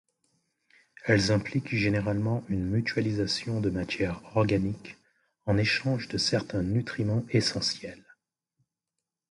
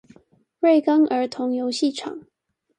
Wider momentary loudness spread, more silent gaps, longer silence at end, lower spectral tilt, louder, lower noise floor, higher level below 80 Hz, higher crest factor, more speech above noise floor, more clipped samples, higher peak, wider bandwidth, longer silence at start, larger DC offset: second, 6 LU vs 16 LU; neither; first, 1.35 s vs 0.6 s; first, -5.5 dB/octave vs -4 dB/octave; second, -28 LUFS vs -21 LUFS; first, -87 dBFS vs -57 dBFS; first, -50 dBFS vs -74 dBFS; about the same, 20 dB vs 16 dB; first, 60 dB vs 37 dB; neither; about the same, -8 dBFS vs -6 dBFS; first, 11.5 kHz vs 9.8 kHz; first, 1.05 s vs 0.6 s; neither